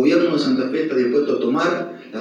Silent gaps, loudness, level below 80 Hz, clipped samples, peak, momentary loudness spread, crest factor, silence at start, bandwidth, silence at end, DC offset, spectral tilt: none; -19 LUFS; -86 dBFS; under 0.1%; -4 dBFS; 5 LU; 14 dB; 0 s; 9.6 kHz; 0 s; under 0.1%; -6 dB/octave